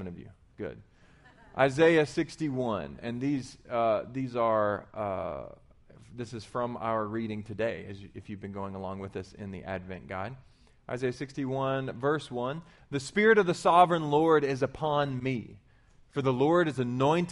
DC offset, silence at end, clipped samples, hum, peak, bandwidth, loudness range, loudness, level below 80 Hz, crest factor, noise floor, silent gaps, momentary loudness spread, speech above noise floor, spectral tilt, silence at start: under 0.1%; 0 s; under 0.1%; none; -8 dBFS; 11.5 kHz; 11 LU; -29 LUFS; -60 dBFS; 22 dB; -60 dBFS; none; 18 LU; 30 dB; -6.5 dB/octave; 0 s